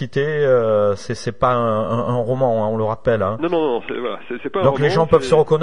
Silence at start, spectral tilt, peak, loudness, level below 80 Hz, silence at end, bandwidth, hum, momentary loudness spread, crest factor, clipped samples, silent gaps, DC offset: 0 s; -7 dB/octave; 0 dBFS; -18 LUFS; -46 dBFS; 0 s; 11 kHz; none; 10 LU; 16 dB; under 0.1%; none; 2%